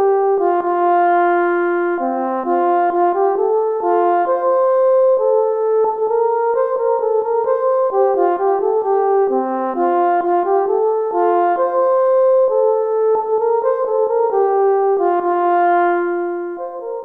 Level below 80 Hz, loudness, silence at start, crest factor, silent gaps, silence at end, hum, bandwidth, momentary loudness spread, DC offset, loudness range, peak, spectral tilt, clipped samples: -66 dBFS; -16 LUFS; 0 s; 12 dB; none; 0 s; none; 3.9 kHz; 4 LU; under 0.1%; 1 LU; -4 dBFS; -7.5 dB/octave; under 0.1%